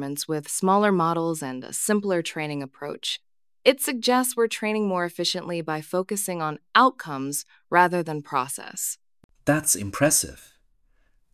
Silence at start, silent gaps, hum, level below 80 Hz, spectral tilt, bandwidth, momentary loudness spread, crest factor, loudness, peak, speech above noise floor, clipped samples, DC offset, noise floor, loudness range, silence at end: 0 s; 9.24-9.29 s; none; -60 dBFS; -3.5 dB/octave; 16 kHz; 11 LU; 22 dB; -24 LUFS; -2 dBFS; 40 dB; under 0.1%; under 0.1%; -64 dBFS; 1 LU; 0.9 s